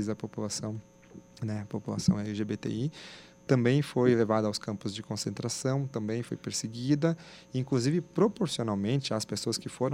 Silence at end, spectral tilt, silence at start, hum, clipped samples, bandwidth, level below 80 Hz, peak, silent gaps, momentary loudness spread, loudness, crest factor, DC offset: 0 s; -5.5 dB/octave; 0 s; none; under 0.1%; 16 kHz; -64 dBFS; -10 dBFS; none; 11 LU; -31 LUFS; 20 dB; under 0.1%